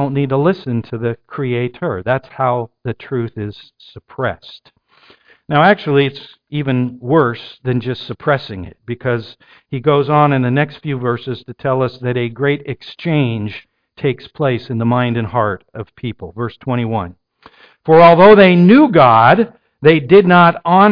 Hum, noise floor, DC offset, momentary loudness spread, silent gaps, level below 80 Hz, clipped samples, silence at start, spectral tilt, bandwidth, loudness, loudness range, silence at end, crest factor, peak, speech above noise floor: none; -50 dBFS; under 0.1%; 19 LU; none; -50 dBFS; under 0.1%; 0 s; -9.5 dB/octave; 5.2 kHz; -14 LUFS; 11 LU; 0 s; 14 dB; 0 dBFS; 36 dB